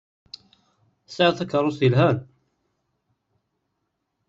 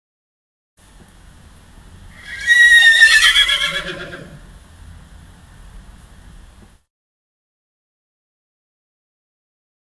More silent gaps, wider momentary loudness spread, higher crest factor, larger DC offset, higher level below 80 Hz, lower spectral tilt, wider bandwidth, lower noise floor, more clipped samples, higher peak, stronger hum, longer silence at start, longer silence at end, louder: neither; about the same, 24 LU vs 24 LU; about the same, 22 dB vs 20 dB; second, under 0.1% vs 0.1%; second, -62 dBFS vs -44 dBFS; first, -7 dB/octave vs 0.5 dB/octave; second, 7.6 kHz vs 12 kHz; first, -77 dBFS vs -45 dBFS; neither; second, -4 dBFS vs 0 dBFS; neither; second, 1.1 s vs 2.25 s; second, 2.05 s vs 5.8 s; second, -21 LUFS vs -9 LUFS